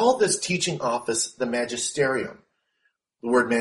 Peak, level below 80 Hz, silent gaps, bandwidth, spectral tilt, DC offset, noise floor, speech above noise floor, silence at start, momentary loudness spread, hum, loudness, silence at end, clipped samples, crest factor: -6 dBFS; -64 dBFS; none; 11.5 kHz; -3 dB/octave; under 0.1%; -72 dBFS; 49 dB; 0 s; 6 LU; none; -24 LUFS; 0 s; under 0.1%; 18 dB